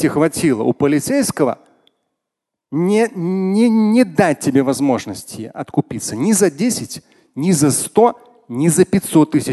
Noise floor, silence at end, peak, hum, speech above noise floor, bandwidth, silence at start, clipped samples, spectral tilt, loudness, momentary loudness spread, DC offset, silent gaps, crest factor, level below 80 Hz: -81 dBFS; 0 s; 0 dBFS; none; 66 dB; 12.5 kHz; 0 s; under 0.1%; -5.5 dB/octave; -16 LUFS; 14 LU; under 0.1%; none; 16 dB; -52 dBFS